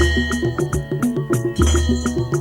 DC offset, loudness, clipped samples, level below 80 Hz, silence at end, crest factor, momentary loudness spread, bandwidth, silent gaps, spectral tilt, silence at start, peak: under 0.1%; -20 LUFS; under 0.1%; -26 dBFS; 0 s; 16 dB; 4 LU; 16.5 kHz; none; -5.5 dB/octave; 0 s; -4 dBFS